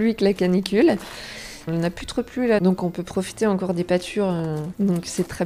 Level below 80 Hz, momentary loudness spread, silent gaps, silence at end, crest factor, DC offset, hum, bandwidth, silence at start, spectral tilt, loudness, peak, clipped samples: -48 dBFS; 9 LU; none; 0 s; 18 dB; under 0.1%; none; 15 kHz; 0 s; -6 dB/octave; -22 LUFS; -4 dBFS; under 0.1%